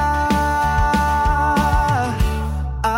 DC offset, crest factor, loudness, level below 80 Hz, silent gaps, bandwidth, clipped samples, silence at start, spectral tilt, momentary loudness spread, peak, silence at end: under 0.1%; 12 dB; -18 LUFS; -24 dBFS; none; 16.5 kHz; under 0.1%; 0 s; -6 dB/octave; 5 LU; -6 dBFS; 0 s